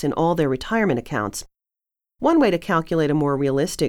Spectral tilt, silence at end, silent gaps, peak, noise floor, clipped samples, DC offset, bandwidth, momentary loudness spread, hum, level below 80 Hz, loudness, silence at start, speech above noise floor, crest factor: -6 dB/octave; 0 s; none; -6 dBFS; -89 dBFS; under 0.1%; under 0.1%; 17 kHz; 8 LU; none; -46 dBFS; -21 LUFS; 0 s; 68 dB; 16 dB